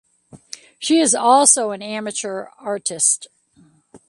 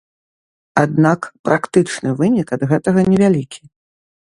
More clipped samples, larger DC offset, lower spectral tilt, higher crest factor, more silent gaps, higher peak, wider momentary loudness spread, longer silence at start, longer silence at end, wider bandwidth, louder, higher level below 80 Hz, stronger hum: neither; neither; second, -1.5 dB/octave vs -7 dB/octave; about the same, 20 dB vs 16 dB; second, none vs 1.39-1.44 s; about the same, 0 dBFS vs 0 dBFS; first, 18 LU vs 7 LU; second, 0.35 s vs 0.75 s; second, 0.1 s vs 0.65 s; about the same, 11.5 kHz vs 11 kHz; about the same, -17 LUFS vs -16 LUFS; second, -70 dBFS vs -52 dBFS; neither